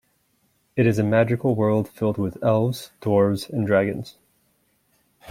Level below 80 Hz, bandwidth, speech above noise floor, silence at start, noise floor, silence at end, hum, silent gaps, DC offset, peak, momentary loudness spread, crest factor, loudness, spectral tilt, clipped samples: -58 dBFS; 16 kHz; 45 dB; 0.75 s; -67 dBFS; 0 s; none; none; under 0.1%; -4 dBFS; 8 LU; 18 dB; -22 LUFS; -7.5 dB/octave; under 0.1%